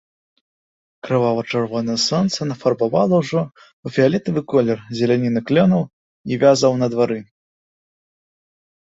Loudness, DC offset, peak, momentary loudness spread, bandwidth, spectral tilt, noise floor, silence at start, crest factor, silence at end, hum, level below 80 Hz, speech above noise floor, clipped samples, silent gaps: -18 LUFS; under 0.1%; -2 dBFS; 10 LU; 8 kHz; -6 dB/octave; under -90 dBFS; 1.05 s; 18 dB; 1.7 s; none; -58 dBFS; over 72 dB; under 0.1%; 3.73-3.83 s, 5.93-6.24 s